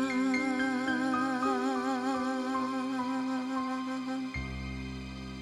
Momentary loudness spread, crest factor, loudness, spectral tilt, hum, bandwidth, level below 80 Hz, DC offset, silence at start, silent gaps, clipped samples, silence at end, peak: 9 LU; 14 dB; -32 LUFS; -5 dB/octave; none; 11 kHz; -50 dBFS; under 0.1%; 0 s; none; under 0.1%; 0 s; -18 dBFS